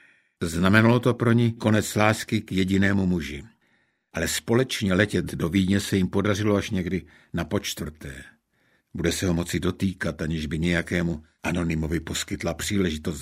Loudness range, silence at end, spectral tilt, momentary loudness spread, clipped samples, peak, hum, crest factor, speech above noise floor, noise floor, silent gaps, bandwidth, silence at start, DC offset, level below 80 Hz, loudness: 6 LU; 0 s; -5.5 dB/octave; 11 LU; under 0.1%; -2 dBFS; none; 22 dB; 43 dB; -67 dBFS; none; 16 kHz; 0.4 s; under 0.1%; -44 dBFS; -24 LUFS